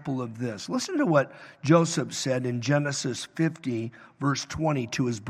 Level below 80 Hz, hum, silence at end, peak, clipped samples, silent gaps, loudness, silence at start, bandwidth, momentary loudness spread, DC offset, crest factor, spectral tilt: -62 dBFS; none; 0 s; -6 dBFS; under 0.1%; none; -27 LUFS; 0 s; 13.5 kHz; 11 LU; under 0.1%; 20 dB; -5.5 dB/octave